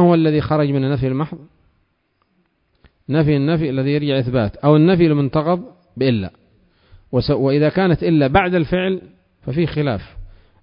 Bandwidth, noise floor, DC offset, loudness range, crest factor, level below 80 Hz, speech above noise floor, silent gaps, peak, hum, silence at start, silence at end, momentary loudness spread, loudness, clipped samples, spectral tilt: 5.4 kHz; -65 dBFS; under 0.1%; 5 LU; 18 dB; -40 dBFS; 49 dB; none; 0 dBFS; none; 0 s; 0.35 s; 11 LU; -17 LUFS; under 0.1%; -12 dB/octave